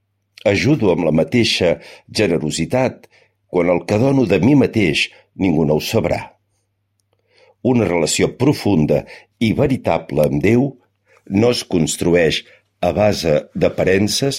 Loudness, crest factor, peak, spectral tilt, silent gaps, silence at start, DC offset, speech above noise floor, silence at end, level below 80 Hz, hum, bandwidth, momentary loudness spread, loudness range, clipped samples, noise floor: -17 LUFS; 16 dB; -2 dBFS; -5.5 dB/octave; none; 0.45 s; under 0.1%; 52 dB; 0 s; -44 dBFS; none; 16 kHz; 7 LU; 3 LU; under 0.1%; -68 dBFS